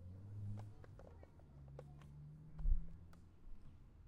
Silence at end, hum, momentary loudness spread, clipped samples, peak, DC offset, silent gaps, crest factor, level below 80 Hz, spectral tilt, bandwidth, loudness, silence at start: 0 s; none; 18 LU; under 0.1%; -24 dBFS; under 0.1%; none; 22 dB; -48 dBFS; -9 dB/octave; 3.1 kHz; -53 LUFS; 0 s